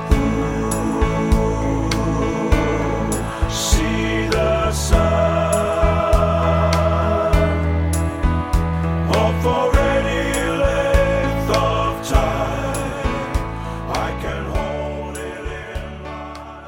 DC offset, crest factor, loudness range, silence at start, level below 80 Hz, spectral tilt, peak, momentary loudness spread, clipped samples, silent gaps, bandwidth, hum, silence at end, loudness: under 0.1%; 18 dB; 6 LU; 0 s; -24 dBFS; -5.5 dB/octave; 0 dBFS; 10 LU; under 0.1%; none; 17 kHz; none; 0 s; -19 LUFS